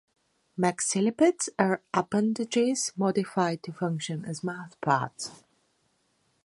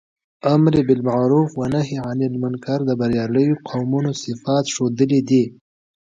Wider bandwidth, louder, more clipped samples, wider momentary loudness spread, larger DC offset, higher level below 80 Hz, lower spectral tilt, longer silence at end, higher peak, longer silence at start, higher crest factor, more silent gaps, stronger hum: first, 11.5 kHz vs 9 kHz; second, -28 LUFS vs -19 LUFS; neither; about the same, 10 LU vs 8 LU; neither; second, -72 dBFS vs -52 dBFS; second, -4.5 dB/octave vs -7 dB/octave; first, 1.1 s vs 0.6 s; second, -6 dBFS vs -2 dBFS; about the same, 0.55 s vs 0.45 s; first, 24 dB vs 16 dB; neither; neither